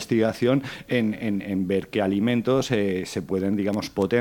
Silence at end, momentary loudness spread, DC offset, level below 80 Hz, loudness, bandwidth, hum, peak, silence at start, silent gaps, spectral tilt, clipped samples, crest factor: 0 s; 5 LU; under 0.1%; -56 dBFS; -24 LUFS; 19 kHz; none; -8 dBFS; 0 s; none; -6.5 dB/octave; under 0.1%; 16 dB